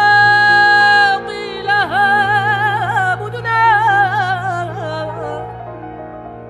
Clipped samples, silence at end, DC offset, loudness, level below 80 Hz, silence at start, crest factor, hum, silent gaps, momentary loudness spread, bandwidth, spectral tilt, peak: under 0.1%; 0 s; under 0.1%; -13 LUFS; -48 dBFS; 0 s; 12 dB; none; none; 20 LU; 12 kHz; -4.5 dB/octave; -2 dBFS